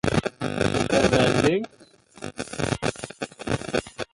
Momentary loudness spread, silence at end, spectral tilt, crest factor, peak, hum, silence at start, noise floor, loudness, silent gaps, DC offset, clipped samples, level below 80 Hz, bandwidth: 16 LU; 0.1 s; -5 dB/octave; 20 dB; -6 dBFS; none; 0.05 s; -49 dBFS; -24 LUFS; none; under 0.1%; under 0.1%; -44 dBFS; 11.5 kHz